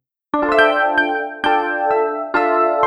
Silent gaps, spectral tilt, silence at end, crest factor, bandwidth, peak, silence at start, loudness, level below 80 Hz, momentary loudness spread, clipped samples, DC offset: none; -4.5 dB/octave; 0 s; 16 dB; 11 kHz; -2 dBFS; 0.35 s; -17 LUFS; -52 dBFS; 6 LU; under 0.1%; under 0.1%